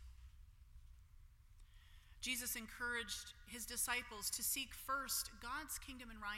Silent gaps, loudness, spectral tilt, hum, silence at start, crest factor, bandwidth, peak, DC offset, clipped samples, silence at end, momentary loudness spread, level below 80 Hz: none; -43 LUFS; -0.5 dB/octave; none; 0 s; 22 dB; 16.5 kHz; -24 dBFS; under 0.1%; under 0.1%; 0 s; 12 LU; -62 dBFS